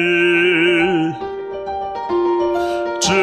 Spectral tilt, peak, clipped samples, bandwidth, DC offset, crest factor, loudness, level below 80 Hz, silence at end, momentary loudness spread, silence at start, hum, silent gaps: -4 dB/octave; -4 dBFS; under 0.1%; 12 kHz; under 0.1%; 14 dB; -17 LUFS; -48 dBFS; 0 s; 12 LU; 0 s; none; none